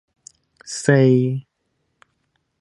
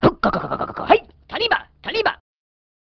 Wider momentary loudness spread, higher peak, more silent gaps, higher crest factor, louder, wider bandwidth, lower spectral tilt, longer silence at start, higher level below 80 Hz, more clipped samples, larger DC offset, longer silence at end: first, 16 LU vs 8 LU; about the same, -2 dBFS vs 0 dBFS; neither; about the same, 20 dB vs 22 dB; first, -18 LUFS vs -21 LUFS; first, 11.5 kHz vs 6.4 kHz; about the same, -6.5 dB/octave vs -7 dB/octave; first, 0.65 s vs 0 s; second, -66 dBFS vs -46 dBFS; neither; neither; first, 1.2 s vs 0.7 s